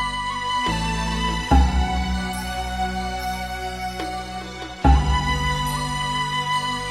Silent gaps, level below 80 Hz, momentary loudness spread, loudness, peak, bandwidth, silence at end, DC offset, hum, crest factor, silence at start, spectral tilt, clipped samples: none; -26 dBFS; 10 LU; -23 LUFS; -4 dBFS; 13.5 kHz; 0 s; 0.2%; none; 18 dB; 0 s; -4.5 dB/octave; under 0.1%